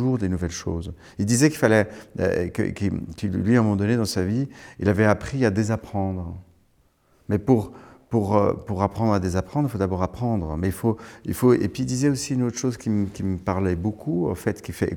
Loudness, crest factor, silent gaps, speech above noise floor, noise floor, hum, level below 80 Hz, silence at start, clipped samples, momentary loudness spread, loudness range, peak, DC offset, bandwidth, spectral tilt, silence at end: -24 LUFS; 22 dB; none; 39 dB; -62 dBFS; none; -48 dBFS; 0 s; under 0.1%; 9 LU; 3 LU; -2 dBFS; under 0.1%; over 20 kHz; -6.5 dB/octave; 0 s